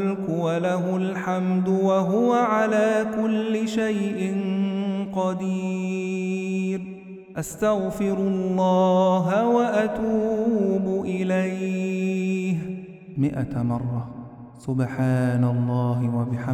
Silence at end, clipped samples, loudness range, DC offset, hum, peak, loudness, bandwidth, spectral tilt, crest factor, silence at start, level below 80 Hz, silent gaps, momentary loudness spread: 0 s; under 0.1%; 5 LU; under 0.1%; none; -10 dBFS; -23 LUFS; 13 kHz; -7.5 dB/octave; 14 dB; 0 s; -56 dBFS; none; 9 LU